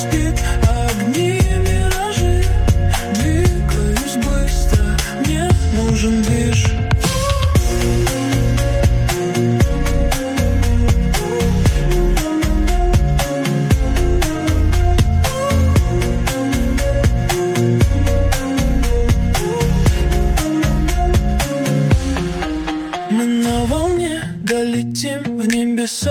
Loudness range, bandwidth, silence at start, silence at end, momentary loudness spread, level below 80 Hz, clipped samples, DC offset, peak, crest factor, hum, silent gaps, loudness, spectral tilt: 2 LU; 19.5 kHz; 0 s; 0 s; 3 LU; -18 dBFS; under 0.1%; under 0.1%; -2 dBFS; 12 dB; none; none; -17 LUFS; -5.5 dB/octave